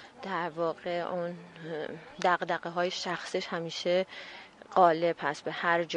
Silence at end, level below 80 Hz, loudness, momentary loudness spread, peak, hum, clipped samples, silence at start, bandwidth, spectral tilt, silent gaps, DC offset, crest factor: 0 s; -76 dBFS; -31 LUFS; 15 LU; -10 dBFS; none; under 0.1%; 0 s; 10.5 kHz; -4.5 dB/octave; none; under 0.1%; 22 dB